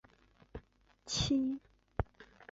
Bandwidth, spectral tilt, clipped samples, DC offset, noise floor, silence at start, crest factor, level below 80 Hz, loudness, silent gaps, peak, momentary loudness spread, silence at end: 7.6 kHz; -5 dB/octave; under 0.1%; under 0.1%; -65 dBFS; 0.55 s; 26 dB; -52 dBFS; -37 LUFS; none; -14 dBFS; 22 LU; 0.1 s